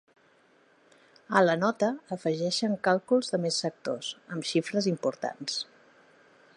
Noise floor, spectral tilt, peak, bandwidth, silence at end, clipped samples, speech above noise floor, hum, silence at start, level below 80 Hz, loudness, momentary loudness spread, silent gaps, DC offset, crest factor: -63 dBFS; -4.5 dB/octave; -6 dBFS; 11 kHz; 0.95 s; under 0.1%; 35 dB; none; 1.3 s; -80 dBFS; -28 LUFS; 10 LU; none; under 0.1%; 24 dB